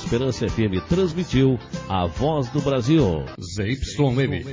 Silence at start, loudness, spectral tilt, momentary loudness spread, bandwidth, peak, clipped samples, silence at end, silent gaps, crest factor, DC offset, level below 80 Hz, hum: 0 s; -22 LUFS; -7 dB/octave; 8 LU; 7.6 kHz; -6 dBFS; under 0.1%; 0 s; none; 14 dB; under 0.1%; -36 dBFS; none